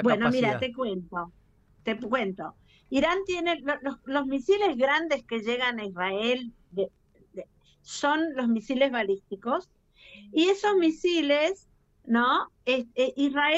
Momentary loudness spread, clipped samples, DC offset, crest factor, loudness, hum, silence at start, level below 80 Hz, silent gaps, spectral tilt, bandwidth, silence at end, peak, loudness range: 13 LU; under 0.1%; under 0.1%; 18 dB; -27 LUFS; none; 0 s; -62 dBFS; none; -4.5 dB/octave; 8.2 kHz; 0 s; -10 dBFS; 4 LU